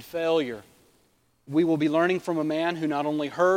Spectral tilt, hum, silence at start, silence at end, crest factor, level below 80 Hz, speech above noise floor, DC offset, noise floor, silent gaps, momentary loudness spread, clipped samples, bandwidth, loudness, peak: -6.5 dB/octave; none; 0 s; 0 s; 16 dB; -70 dBFS; 41 dB; under 0.1%; -66 dBFS; none; 6 LU; under 0.1%; 16 kHz; -26 LUFS; -10 dBFS